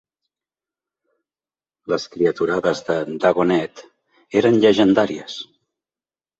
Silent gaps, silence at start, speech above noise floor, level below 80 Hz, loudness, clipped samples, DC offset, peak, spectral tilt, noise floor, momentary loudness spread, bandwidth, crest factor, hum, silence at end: none; 1.9 s; over 72 dB; -60 dBFS; -18 LUFS; under 0.1%; under 0.1%; -2 dBFS; -6 dB/octave; under -90 dBFS; 18 LU; 8 kHz; 18 dB; none; 0.95 s